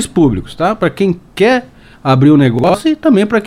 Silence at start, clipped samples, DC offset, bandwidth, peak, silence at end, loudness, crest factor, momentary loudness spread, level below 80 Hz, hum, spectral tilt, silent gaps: 0 s; under 0.1%; under 0.1%; 14 kHz; 0 dBFS; 0 s; -12 LUFS; 12 dB; 8 LU; -38 dBFS; none; -6.5 dB/octave; none